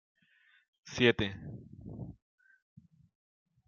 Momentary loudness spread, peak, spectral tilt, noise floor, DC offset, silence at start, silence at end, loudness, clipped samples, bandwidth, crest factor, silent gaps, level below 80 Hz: 21 LU; -12 dBFS; -3.5 dB/octave; -68 dBFS; under 0.1%; 0.85 s; 1.55 s; -30 LUFS; under 0.1%; 7.2 kHz; 26 dB; none; -62 dBFS